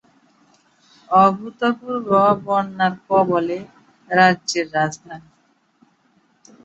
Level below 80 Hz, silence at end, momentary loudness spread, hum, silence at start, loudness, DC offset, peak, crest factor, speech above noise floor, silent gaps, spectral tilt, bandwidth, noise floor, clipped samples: -62 dBFS; 1.45 s; 11 LU; none; 1.1 s; -18 LUFS; under 0.1%; 0 dBFS; 20 dB; 43 dB; none; -5 dB/octave; 8.2 kHz; -61 dBFS; under 0.1%